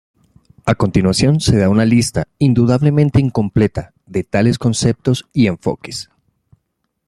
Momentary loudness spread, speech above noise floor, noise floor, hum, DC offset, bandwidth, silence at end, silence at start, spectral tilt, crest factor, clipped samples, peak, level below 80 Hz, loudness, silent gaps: 11 LU; 56 dB; -70 dBFS; none; under 0.1%; 13.5 kHz; 1.05 s; 0.65 s; -6.5 dB/octave; 16 dB; under 0.1%; 0 dBFS; -38 dBFS; -15 LUFS; none